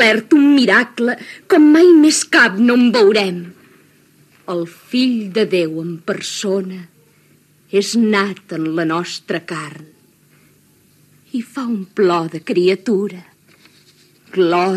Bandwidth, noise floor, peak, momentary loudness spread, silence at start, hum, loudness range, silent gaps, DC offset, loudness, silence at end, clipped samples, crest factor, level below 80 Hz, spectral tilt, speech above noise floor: 13.5 kHz; -53 dBFS; 0 dBFS; 15 LU; 0 s; none; 11 LU; none; under 0.1%; -15 LUFS; 0 s; under 0.1%; 16 dB; -76 dBFS; -4.5 dB/octave; 38 dB